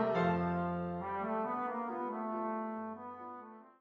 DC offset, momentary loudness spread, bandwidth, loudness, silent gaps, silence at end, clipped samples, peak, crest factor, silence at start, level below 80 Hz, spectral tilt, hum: under 0.1%; 15 LU; 5.8 kHz; -37 LUFS; none; 0.1 s; under 0.1%; -20 dBFS; 18 dB; 0 s; -66 dBFS; -9 dB/octave; none